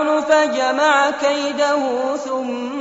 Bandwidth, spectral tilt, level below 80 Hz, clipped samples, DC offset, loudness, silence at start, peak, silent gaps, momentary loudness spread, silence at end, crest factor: 8 kHz; 0 dB/octave; -62 dBFS; under 0.1%; under 0.1%; -18 LUFS; 0 s; -4 dBFS; none; 8 LU; 0 s; 14 dB